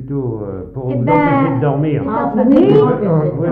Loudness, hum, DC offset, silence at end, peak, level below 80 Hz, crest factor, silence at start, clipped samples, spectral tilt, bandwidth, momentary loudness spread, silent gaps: -14 LUFS; none; under 0.1%; 0 s; -2 dBFS; -42 dBFS; 12 dB; 0 s; under 0.1%; -11 dB/octave; 4.7 kHz; 12 LU; none